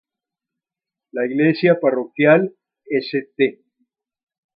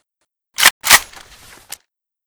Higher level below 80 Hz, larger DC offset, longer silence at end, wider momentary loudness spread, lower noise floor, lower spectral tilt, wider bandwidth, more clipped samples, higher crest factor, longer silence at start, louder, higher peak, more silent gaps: second, -74 dBFS vs -48 dBFS; neither; second, 1.05 s vs 1.25 s; second, 11 LU vs 25 LU; first, -88 dBFS vs -74 dBFS; first, -10 dB/octave vs 1.5 dB/octave; second, 5.4 kHz vs over 20 kHz; second, under 0.1% vs 0.3%; about the same, 20 dB vs 18 dB; first, 1.15 s vs 0.6 s; second, -18 LUFS vs -11 LUFS; about the same, 0 dBFS vs 0 dBFS; second, none vs 0.71-0.81 s